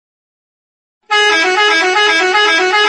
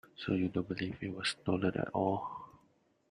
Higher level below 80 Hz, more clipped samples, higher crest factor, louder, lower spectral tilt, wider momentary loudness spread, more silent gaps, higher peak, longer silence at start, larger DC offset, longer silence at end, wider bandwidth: about the same, -62 dBFS vs -66 dBFS; neither; second, 12 dB vs 18 dB; first, -10 LUFS vs -36 LUFS; second, 0.5 dB/octave vs -6 dB/octave; second, 1 LU vs 9 LU; neither; first, 0 dBFS vs -18 dBFS; first, 1.1 s vs 0.2 s; neither; second, 0 s vs 0.55 s; about the same, 11 kHz vs 11.5 kHz